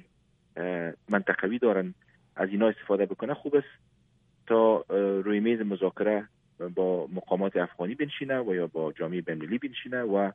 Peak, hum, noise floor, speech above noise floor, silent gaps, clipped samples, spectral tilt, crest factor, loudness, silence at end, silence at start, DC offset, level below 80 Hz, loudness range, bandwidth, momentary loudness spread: -10 dBFS; none; -66 dBFS; 39 dB; none; under 0.1%; -9 dB/octave; 20 dB; -29 LUFS; 0 s; 0.55 s; under 0.1%; -72 dBFS; 3 LU; 3.8 kHz; 7 LU